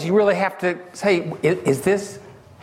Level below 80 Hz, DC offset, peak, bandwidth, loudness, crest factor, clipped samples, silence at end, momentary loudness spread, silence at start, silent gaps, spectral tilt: -58 dBFS; under 0.1%; -6 dBFS; 15.5 kHz; -21 LUFS; 14 dB; under 0.1%; 0.3 s; 7 LU; 0 s; none; -5.5 dB/octave